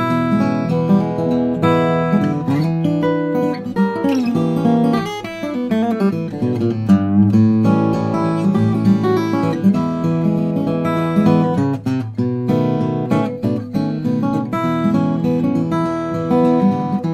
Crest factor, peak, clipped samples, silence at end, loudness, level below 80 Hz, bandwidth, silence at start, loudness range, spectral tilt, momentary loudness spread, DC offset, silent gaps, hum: 14 dB; -2 dBFS; under 0.1%; 0 s; -17 LUFS; -50 dBFS; 12.5 kHz; 0 s; 3 LU; -8.5 dB/octave; 6 LU; under 0.1%; none; none